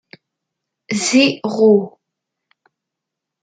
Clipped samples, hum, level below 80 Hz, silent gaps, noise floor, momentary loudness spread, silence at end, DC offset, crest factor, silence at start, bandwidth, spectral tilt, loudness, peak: under 0.1%; none; -66 dBFS; none; -82 dBFS; 11 LU; 1.55 s; under 0.1%; 18 dB; 0.9 s; 9.6 kHz; -4 dB/octave; -15 LUFS; -2 dBFS